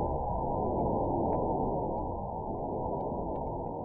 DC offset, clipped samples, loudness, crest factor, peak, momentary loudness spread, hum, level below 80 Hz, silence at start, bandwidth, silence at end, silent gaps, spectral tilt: under 0.1%; under 0.1%; -33 LUFS; 14 dB; -18 dBFS; 6 LU; none; -42 dBFS; 0 s; 2.6 kHz; 0 s; none; -13.5 dB/octave